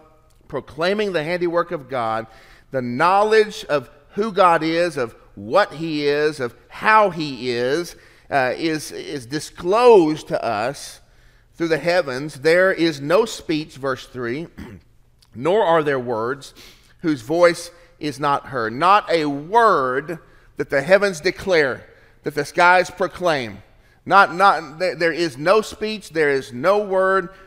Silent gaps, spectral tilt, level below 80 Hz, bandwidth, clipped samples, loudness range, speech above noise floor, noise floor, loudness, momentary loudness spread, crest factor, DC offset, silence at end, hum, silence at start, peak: none; -5 dB/octave; -52 dBFS; 16 kHz; under 0.1%; 3 LU; 32 dB; -52 dBFS; -19 LUFS; 15 LU; 20 dB; under 0.1%; 0.15 s; none; 0.5 s; 0 dBFS